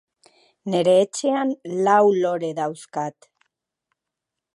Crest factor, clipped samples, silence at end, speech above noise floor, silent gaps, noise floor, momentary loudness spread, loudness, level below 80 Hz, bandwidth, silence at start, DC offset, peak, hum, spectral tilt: 18 dB; under 0.1%; 1.45 s; 64 dB; none; -84 dBFS; 13 LU; -21 LUFS; -76 dBFS; 11.5 kHz; 0.65 s; under 0.1%; -4 dBFS; none; -5 dB/octave